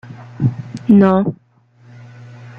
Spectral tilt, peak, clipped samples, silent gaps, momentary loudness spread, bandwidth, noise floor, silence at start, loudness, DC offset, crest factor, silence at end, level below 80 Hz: -10 dB/octave; -2 dBFS; under 0.1%; none; 14 LU; 6.4 kHz; -48 dBFS; 0.1 s; -15 LUFS; under 0.1%; 16 dB; 0.1 s; -54 dBFS